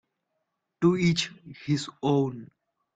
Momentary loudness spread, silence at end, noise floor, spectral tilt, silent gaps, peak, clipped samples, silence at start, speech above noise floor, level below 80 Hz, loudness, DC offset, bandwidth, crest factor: 13 LU; 0.5 s; -80 dBFS; -6 dB/octave; none; -10 dBFS; under 0.1%; 0.8 s; 54 dB; -62 dBFS; -27 LUFS; under 0.1%; 9.2 kHz; 18 dB